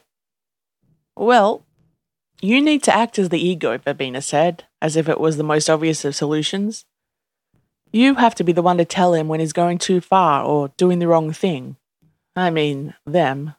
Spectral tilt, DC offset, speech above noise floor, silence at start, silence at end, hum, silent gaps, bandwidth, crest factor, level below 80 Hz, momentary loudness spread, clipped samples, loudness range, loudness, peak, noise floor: -5 dB/octave; under 0.1%; 72 dB; 1.2 s; 0.05 s; none; none; 13 kHz; 18 dB; -66 dBFS; 9 LU; under 0.1%; 3 LU; -18 LUFS; 0 dBFS; -89 dBFS